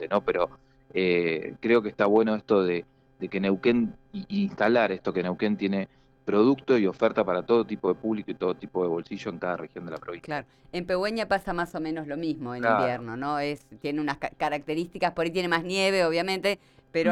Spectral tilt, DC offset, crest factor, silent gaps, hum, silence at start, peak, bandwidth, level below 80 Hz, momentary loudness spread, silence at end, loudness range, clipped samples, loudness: -6 dB/octave; under 0.1%; 16 dB; none; none; 0 s; -10 dBFS; 13 kHz; -58 dBFS; 11 LU; 0 s; 5 LU; under 0.1%; -27 LUFS